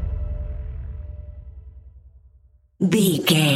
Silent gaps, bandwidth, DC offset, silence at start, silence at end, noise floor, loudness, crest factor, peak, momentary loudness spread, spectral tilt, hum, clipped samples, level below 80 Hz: none; 16 kHz; under 0.1%; 0 s; 0 s; -55 dBFS; -22 LUFS; 20 dB; -4 dBFS; 24 LU; -5 dB/octave; none; under 0.1%; -34 dBFS